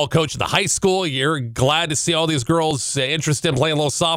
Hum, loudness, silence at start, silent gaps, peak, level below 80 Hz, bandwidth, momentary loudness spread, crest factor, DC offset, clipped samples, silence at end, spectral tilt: none; -19 LUFS; 0 s; none; -6 dBFS; -46 dBFS; 16.5 kHz; 3 LU; 14 dB; under 0.1%; under 0.1%; 0 s; -3.5 dB/octave